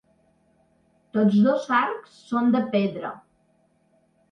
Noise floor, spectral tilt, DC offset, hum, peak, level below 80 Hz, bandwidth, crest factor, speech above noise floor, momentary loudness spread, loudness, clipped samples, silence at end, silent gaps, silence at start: -65 dBFS; -7.5 dB/octave; under 0.1%; none; -8 dBFS; -72 dBFS; 6.4 kHz; 16 dB; 43 dB; 16 LU; -23 LUFS; under 0.1%; 1.1 s; none; 1.15 s